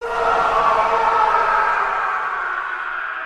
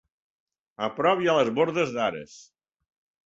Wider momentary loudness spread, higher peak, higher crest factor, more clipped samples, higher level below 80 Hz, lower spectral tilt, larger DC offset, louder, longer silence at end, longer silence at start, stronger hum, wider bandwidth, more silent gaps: second, 8 LU vs 13 LU; first, -4 dBFS vs -8 dBFS; about the same, 14 dB vs 18 dB; neither; first, -44 dBFS vs -68 dBFS; second, -3 dB/octave vs -5 dB/octave; neither; first, -18 LUFS vs -25 LUFS; second, 0 s vs 0.85 s; second, 0 s vs 0.8 s; neither; first, 11.5 kHz vs 7.8 kHz; neither